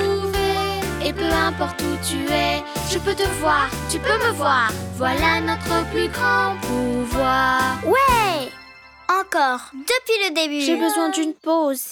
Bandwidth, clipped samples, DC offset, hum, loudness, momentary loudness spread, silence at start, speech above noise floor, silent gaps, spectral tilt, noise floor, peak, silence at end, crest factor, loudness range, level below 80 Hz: 19 kHz; under 0.1%; under 0.1%; none; -20 LUFS; 6 LU; 0 s; 24 dB; none; -4 dB/octave; -44 dBFS; -6 dBFS; 0 s; 14 dB; 2 LU; -38 dBFS